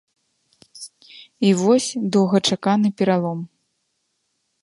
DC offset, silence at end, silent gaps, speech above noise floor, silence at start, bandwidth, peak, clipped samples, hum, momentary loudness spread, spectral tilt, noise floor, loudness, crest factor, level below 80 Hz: under 0.1%; 1.15 s; none; 54 dB; 0.75 s; 11.5 kHz; -4 dBFS; under 0.1%; none; 21 LU; -5.5 dB/octave; -72 dBFS; -19 LUFS; 18 dB; -68 dBFS